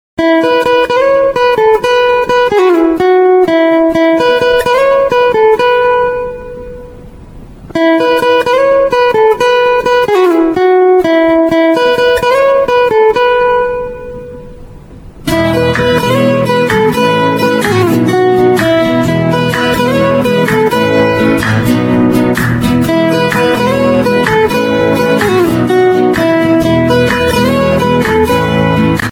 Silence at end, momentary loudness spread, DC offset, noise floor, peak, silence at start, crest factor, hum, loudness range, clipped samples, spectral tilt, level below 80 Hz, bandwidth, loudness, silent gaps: 0 s; 3 LU; under 0.1%; -31 dBFS; 0 dBFS; 0.2 s; 10 dB; none; 3 LU; under 0.1%; -6 dB/octave; -34 dBFS; 17.5 kHz; -9 LUFS; none